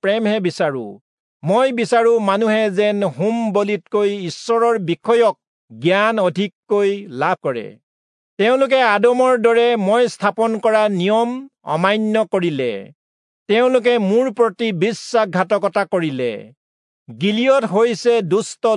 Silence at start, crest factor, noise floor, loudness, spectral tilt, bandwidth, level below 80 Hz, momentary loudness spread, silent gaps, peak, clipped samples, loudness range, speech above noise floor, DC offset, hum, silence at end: 0.05 s; 16 dB; under -90 dBFS; -17 LUFS; -5.5 dB/octave; 11 kHz; -76 dBFS; 9 LU; 1.01-1.40 s, 5.47-5.68 s, 6.55-6.63 s, 7.83-8.37 s, 12.95-13.46 s, 16.57-17.06 s; -2 dBFS; under 0.1%; 3 LU; over 73 dB; under 0.1%; none; 0 s